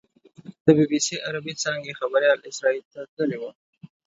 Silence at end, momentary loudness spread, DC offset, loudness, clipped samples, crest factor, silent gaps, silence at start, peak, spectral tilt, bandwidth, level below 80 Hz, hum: 0.2 s; 12 LU; under 0.1%; -23 LUFS; under 0.1%; 22 dB; 0.60-0.65 s, 2.85-2.91 s, 3.08-3.17 s, 3.55-3.73 s; 0.45 s; -4 dBFS; -4.5 dB/octave; 8 kHz; -68 dBFS; none